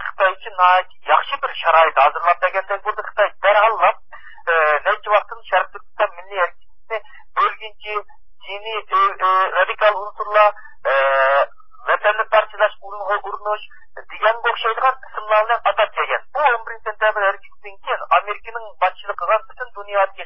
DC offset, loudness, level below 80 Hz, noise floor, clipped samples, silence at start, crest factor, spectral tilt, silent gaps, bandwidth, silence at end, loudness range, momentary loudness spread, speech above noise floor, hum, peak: 2%; -18 LUFS; -60 dBFS; -43 dBFS; under 0.1%; 0 s; 20 dB; -5 dB/octave; none; 5.8 kHz; 0 s; 4 LU; 14 LU; 26 dB; none; 0 dBFS